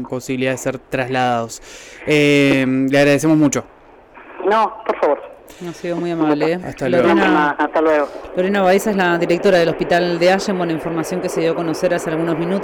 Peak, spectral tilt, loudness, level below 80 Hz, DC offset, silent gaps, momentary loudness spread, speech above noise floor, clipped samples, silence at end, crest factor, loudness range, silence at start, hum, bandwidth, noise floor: -6 dBFS; -5.5 dB/octave; -17 LUFS; -50 dBFS; under 0.1%; none; 10 LU; 26 dB; under 0.1%; 0 s; 10 dB; 3 LU; 0 s; none; 18 kHz; -43 dBFS